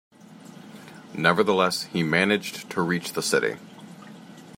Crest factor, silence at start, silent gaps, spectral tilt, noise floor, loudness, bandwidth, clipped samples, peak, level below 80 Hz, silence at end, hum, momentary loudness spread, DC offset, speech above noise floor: 24 dB; 0.3 s; none; -4 dB/octave; -46 dBFS; -24 LUFS; 16 kHz; under 0.1%; -4 dBFS; -68 dBFS; 0 s; none; 23 LU; under 0.1%; 22 dB